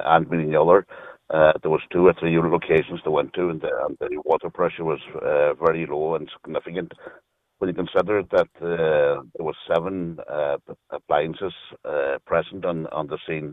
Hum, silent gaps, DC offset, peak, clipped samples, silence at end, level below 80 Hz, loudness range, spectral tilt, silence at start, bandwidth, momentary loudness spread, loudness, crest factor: none; none; under 0.1%; -2 dBFS; under 0.1%; 0 s; -54 dBFS; 6 LU; -8.5 dB/octave; 0 s; 4.7 kHz; 13 LU; -23 LUFS; 20 dB